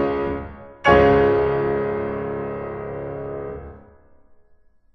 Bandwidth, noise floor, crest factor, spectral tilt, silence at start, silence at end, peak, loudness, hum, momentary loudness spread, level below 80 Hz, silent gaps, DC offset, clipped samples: 6.2 kHz; -54 dBFS; 20 dB; -7.5 dB/octave; 0 s; 1.15 s; -2 dBFS; -21 LUFS; none; 18 LU; -40 dBFS; none; under 0.1%; under 0.1%